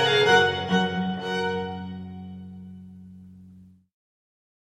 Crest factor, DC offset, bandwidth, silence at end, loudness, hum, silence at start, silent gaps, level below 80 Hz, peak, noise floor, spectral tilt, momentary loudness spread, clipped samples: 20 dB; under 0.1%; 13.5 kHz; 1.05 s; -23 LUFS; none; 0 s; none; -60 dBFS; -6 dBFS; -51 dBFS; -4.5 dB/octave; 26 LU; under 0.1%